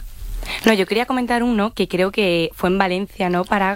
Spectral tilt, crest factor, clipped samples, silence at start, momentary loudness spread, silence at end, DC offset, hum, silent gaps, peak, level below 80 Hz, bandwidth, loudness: -5.5 dB/octave; 18 dB; under 0.1%; 0 s; 5 LU; 0 s; under 0.1%; none; none; -2 dBFS; -36 dBFS; 16 kHz; -19 LUFS